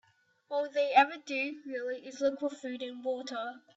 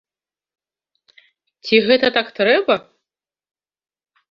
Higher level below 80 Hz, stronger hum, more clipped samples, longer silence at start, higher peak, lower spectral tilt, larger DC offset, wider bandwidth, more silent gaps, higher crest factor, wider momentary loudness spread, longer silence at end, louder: second, -84 dBFS vs -64 dBFS; neither; neither; second, 0.5 s vs 1.65 s; second, -10 dBFS vs -2 dBFS; second, -2.5 dB/octave vs -5.5 dB/octave; neither; first, 8 kHz vs 6.6 kHz; neither; about the same, 22 dB vs 20 dB; first, 13 LU vs 7 LU; second, 0.2 s vs 1.5 s; second, -32 LUFS vs -16 LUFS